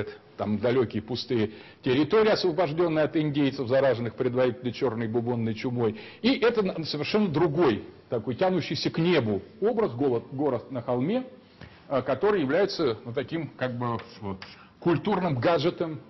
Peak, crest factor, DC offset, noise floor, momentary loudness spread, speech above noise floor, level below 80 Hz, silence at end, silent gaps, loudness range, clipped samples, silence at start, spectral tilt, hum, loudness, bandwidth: -12 dBFS; 14 dB; under 0.1%; -49 dBFS; 9 LU; 23 dB; -60 dBFS; 0.05 s; none; 3 LU; under 0.1%; 0 s; -7.5 dB/octave; none; -27 LUFS; 6.2 kHz